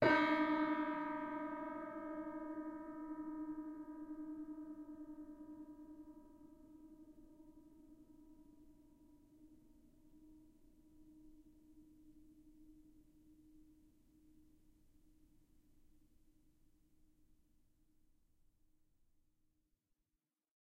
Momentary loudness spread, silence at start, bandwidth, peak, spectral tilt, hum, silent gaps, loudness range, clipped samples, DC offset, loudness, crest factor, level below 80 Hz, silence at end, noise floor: 28 LU; 0 s; 7.4 kHz; -20 dBFS; -6.5 dB/octave; none; none; 23 LU; under 0.1%; under 0.1%; -43 LUFS; 26 dB; -72 dBFS; 7 s; under -90 dBFS